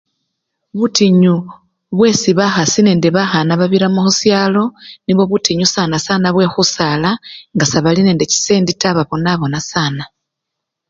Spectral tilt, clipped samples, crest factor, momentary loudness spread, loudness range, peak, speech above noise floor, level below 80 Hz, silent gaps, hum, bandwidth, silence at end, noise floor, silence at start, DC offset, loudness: -4.5 dB/octave; under 0.1%; 14 dB; 8 LU; 2 LU; 0 dBFS; 65 dB; -48 dBFS; none; none; 7.8 kHz; 0.85 s; -78 dBFS; 0.75 s; under 0.1%; -13 LUFS